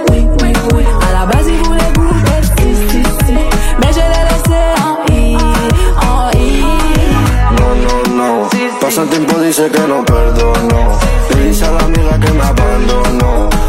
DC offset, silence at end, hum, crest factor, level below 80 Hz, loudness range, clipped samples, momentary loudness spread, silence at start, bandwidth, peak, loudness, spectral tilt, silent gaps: under 0.1%; 0 s; none; 8 dB; -12 dBFS; 0 LU; under 0.1%; 2 LU; 0 s; 16 kHz; 0 dBFS; -11 LUFS; -5.5 dB/octave; none